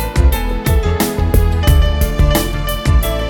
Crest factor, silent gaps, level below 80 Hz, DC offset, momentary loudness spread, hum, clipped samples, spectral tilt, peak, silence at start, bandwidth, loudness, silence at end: 12 dB; none; -14 dBFS; under 0.1%; 4 LU; none; under 0.1%; -5.5 dB/octave; 0 dBFS; 0 s; 19.5 kHz; -15 LUFS; 0 s